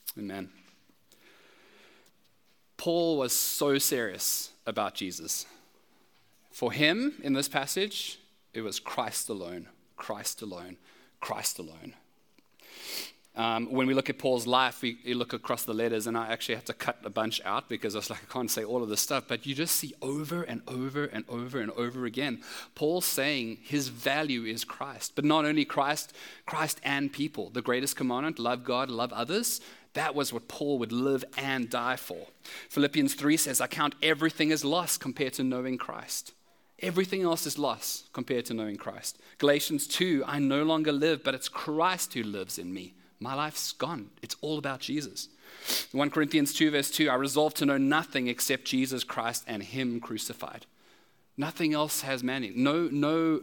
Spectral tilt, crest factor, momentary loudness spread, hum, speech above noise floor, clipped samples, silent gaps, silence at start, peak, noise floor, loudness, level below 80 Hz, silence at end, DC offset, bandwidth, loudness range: -3.5 dB/octave; 24 dB; 12 LU; none; 40 dB; under 0.1%; none; 0.05 s; -8 dBFS; -70 dBFS; -30 LUFS; -80 dBFS; 0 s; under 0.1%; 18 kHz; 6 LU